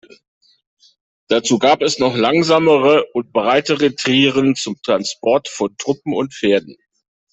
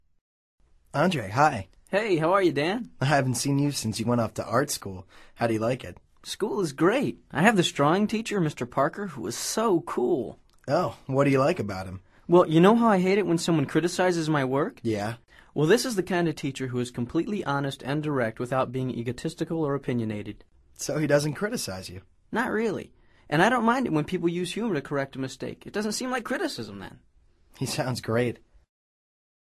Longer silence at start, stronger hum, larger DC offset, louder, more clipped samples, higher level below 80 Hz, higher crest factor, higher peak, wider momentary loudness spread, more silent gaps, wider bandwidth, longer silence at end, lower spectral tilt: first, 1.3 s vs 0.95 s; neither; neither; first, -16 LUFS vs -26 LUFS; neither; about the same, -58 dBFS vs -58 dBFS; second, 16 dB vs 24 dB; first, 0 dBFS vs -4 dBFS; second, 8 LU vs 13 LU; neither; second, 8.4 kHz vs 13.5 kHz; second, 0.6 s vs 1.05 s; second, -4 dB/octave vs -5.5 dB/octave